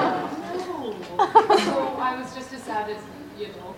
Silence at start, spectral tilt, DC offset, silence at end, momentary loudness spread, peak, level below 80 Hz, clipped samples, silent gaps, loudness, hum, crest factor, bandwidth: 0 s; -4.5 dB/octave; under 0.1%; 0 s; 18 LU; -2 dBFS; -62 dBFS; under 0.1%; none; -24 LUFS; none; 22 dB; 16.5 kHz